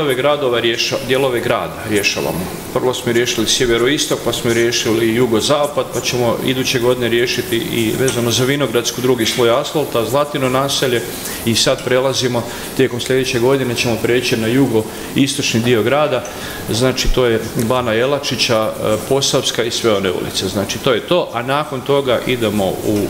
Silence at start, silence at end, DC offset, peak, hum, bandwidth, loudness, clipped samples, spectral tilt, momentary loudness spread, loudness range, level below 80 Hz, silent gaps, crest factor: 0 s; 0 s; under 0.1%; 0 dBFS; none; 16.5 kHz; -16 LUFS; under 0.1%; -4 dB/octave; 5 LU; 1 LU; -36 dBFS; none; 16 dB